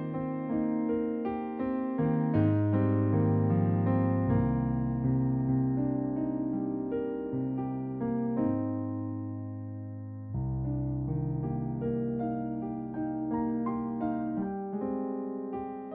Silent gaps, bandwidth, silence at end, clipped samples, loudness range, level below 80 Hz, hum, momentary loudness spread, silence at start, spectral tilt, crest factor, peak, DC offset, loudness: none; 3.4 kHz; 0 s; under 0.1%; 6 LU; -50 dBFS; none; 9 LU; 0 s; -11 dB/octave; 16 dB; -14 dBFS; under 0.1%; -31 LUFS